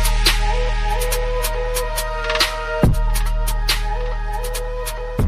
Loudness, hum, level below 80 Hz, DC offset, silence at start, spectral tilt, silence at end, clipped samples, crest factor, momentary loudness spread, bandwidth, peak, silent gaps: -21 LUFS; none; -20 dBFS; under 0.1%; 0 s; -3.5 dB/octave; 0 s; under 0.1%; 14 dB; 8 LU; 16 kHz; -4 dBFS; none